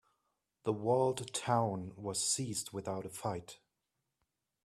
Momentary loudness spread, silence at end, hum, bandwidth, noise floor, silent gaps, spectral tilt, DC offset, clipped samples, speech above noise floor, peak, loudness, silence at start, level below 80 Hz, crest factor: 10 LU; 1.1 s; none; 15.5 kHz; -86 dBFS; none; -4 dB/octave; under 0.1%; under 0.1%; 51 dB; -16 dBFS; -36 LUFS; 0.65 s; -72 dBFS; 22 dB